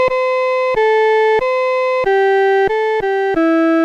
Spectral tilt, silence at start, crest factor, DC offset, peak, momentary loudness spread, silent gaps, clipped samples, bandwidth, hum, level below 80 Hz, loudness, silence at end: -5 dB/octave; 0 s; 8 dB; under 0.1%; -6 dBFS; 4 LU; none; under 0.1%; 8.6 kHz; none; -46 dBFS; -14 LUFS; 0 s